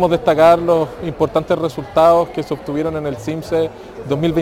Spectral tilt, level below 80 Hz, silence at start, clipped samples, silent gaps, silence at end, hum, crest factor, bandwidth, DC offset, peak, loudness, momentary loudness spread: -7 dB/octave; -42 dBFS; 0 s; under 0.1%; none; 0 s; none; 14 dB; 17 kHz; under 0.1%; -2 dBFS; -16 LUFS; 12 LU